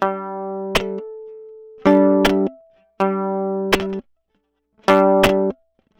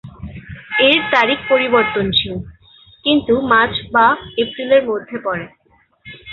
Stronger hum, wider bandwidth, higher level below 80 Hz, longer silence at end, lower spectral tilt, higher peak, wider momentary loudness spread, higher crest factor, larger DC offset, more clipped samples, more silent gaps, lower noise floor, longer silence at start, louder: neither; first, over 20 kHz vs 6.8 kHz; about the same, -44 dBFS vs -44 dBFS; first, 0.45 s vs 0 s; about the same, -5.5 dB/octave vs -6 dB/octave; second, -4 dBFS vs 0 dBFS; about the same, 19 LU vs 19 LU; about the same, 16 dB vs 16 dB; neither; neither; neither; first, -69 dBFS vs -51 dBFS; about the same, 0 s vs 0.05 s; second, -18 LUFS vs -15 LUFS